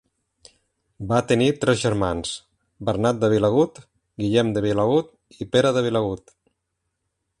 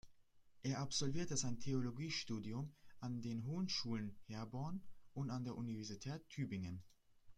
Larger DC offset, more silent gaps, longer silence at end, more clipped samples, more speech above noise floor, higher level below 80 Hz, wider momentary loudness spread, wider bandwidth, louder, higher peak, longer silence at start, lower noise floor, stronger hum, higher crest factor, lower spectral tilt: neither; neither; first, 1.25 s vs 0.05 s; neither; first, 57 dB vs 24 dB; first, -50 dBFS vs -68 dBFS; first, 12 LU vs 9 LU; about the same, 11.5 kHz vs 12 kHz; first, -21 LUFS vs -45 LUFS; first, -4 dBFS vs -26 dBFS; first, 1 s vs 0.05 s; first, -77 dBFS vs -67 dBFS; neither; about the same, 18 dB vs 18 dB; first, -6 dB/octave vs -4.5 dB/octave